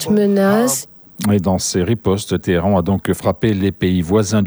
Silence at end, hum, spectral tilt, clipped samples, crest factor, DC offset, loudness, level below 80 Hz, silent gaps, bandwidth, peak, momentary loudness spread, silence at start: 0 s; none; -5.5 dB/octave; under 0.1%; 14 dB; under 0.1%; -17 LUFS; -42 dBFS; none; over 20 kHz; -2 dBFS; 5 LU; 0 s